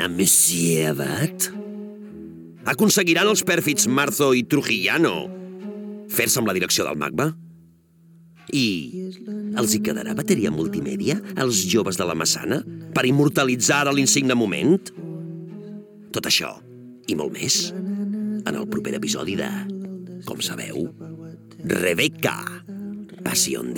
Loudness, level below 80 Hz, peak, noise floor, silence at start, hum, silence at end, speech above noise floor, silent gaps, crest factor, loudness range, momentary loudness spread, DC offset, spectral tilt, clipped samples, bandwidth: -21 LUFS; -60 dBFS; -4 dBFS; -53 dBFS; 0 s; none; 0 s; 31 dB; none; 18 dB; 6 LU; 18 LU; under 0.1%; -3.5 dB/octave; under 0.1%; 19 kHz